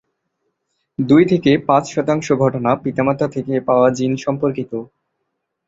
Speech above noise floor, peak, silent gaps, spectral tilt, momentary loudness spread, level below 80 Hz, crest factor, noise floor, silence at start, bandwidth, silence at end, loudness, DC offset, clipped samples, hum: 58 dB; -2 dBFS; none; -7 dB/octave; 11 LU; -54 dBFS; 16 dB; -74 dBFS; 1 s; 7.8 kHz; 0.85 s; -17 LUFS; under 0.1%; under 0.1%; none